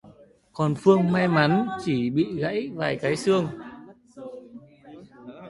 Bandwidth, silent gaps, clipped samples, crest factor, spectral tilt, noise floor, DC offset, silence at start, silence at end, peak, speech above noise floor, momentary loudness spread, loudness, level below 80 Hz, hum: 11.5 kHz; none; under 0.1%; 20 dB; -7 dB/octave; -52 dBFS; under 0.1%; 0.05 s; 0 s; -4 dBFS; 30 dB; 23 LU; -23 LUFS; -60 dBFS; none